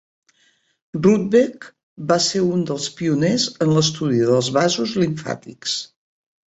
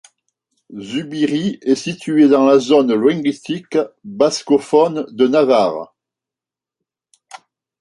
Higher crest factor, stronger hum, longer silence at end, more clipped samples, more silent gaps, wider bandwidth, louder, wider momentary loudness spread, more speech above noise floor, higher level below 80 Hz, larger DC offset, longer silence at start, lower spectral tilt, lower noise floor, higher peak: about the same, 16 dB vs 16 dB; neither; first, 0.6 s vs 0.45 s; neither; first, 1.83-1.96 s vs none; second, 8.2 kHz vs 11.5 kHz; second, -19 LUFS vs -16 LUFS; second, 10 LU vs 13 LU; second, 43 dB vs 73 dB; first, -58 dBFS vs -64 dBFS; neither; first, 0.95 s vs 0.7 s; about the same, -5 dB/octave vs -5.5 dB/octave; second, -62 dBFS vs -88 dBFS; about the same, -4 dBFS vs -2 dBFS